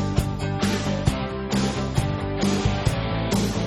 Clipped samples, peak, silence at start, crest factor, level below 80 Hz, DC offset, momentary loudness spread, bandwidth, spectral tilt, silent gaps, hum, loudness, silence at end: under 0.1%; -4 dBFS; 0 s; 20 dB; -34 dBFS; under 0.1%; 3 LU; 13.5 kHz; -5.5 dB/octave; none; none; -24 LUFS; 0 s